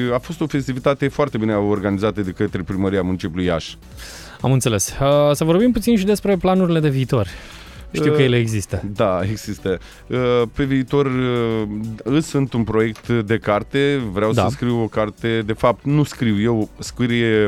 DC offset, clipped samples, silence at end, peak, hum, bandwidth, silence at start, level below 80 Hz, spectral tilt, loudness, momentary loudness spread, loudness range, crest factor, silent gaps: under 0.1%; under 0.1%; 0 s; -2 dBFS; none; 16 kHz; 0 s; -40 dBFS; -6 dB/octave; -19 LUFS; 9 LU; 3 LU; 16 dB; none